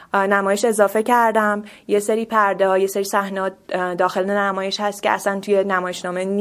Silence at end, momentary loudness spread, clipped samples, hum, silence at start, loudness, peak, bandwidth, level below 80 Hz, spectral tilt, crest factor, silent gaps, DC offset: 0 s; 8 LU; under 0.1%; none; 0 s; -19 LUFS; -2 dBFS; 16 kHz; -64 dBFS; -4 dB/octave; 18 dB; none; under 0.1%